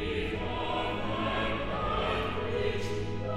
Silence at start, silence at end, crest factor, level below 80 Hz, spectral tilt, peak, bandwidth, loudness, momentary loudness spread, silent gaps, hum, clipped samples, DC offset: 0 s; 0 s; 14 dB; -42 dBFS; -6 dB/octave; -18 dBFS; 12.5 kHz; -32 LUFS; 3 LU; none; none; under 0.1%; under 0.1%